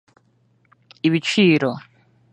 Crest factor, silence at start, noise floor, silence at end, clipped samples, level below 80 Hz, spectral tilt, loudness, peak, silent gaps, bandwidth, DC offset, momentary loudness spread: 18 dB; 1.05 s; -61 dBFS; 0.55 s; under 0.1%; -68 dBFS; -5.5 dB/octave; -18 LUFS; -4 dBFS; none; 11 kHz; under 0.1%; 10 LU